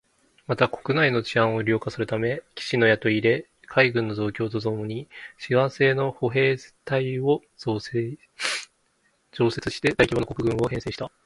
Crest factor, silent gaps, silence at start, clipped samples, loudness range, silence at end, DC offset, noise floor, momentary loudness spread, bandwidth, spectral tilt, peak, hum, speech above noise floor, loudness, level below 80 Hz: 24 dB; none; 0.5 s; under 0.1%; 4 LU; 0.15 s; under 0.1%; -67 dBFS; 10 LU; 11.5 kHz; -6 dB/octave; 0 dBFS; none; 43 dB; -24 LUFS; -52 dBFS